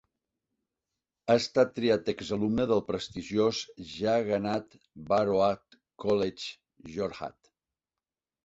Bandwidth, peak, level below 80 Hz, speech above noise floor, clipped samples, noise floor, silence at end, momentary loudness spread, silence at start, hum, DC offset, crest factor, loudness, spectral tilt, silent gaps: 8 kHz; -10 dBFS; -62 dBFS; over 61 dB; under 0.1%; under -90 dBFS; 1.15 s; 14 LU; 1.25 s; none; under 0.1%; 20 dB; -29 LUFS; -5.5 dB/octave; none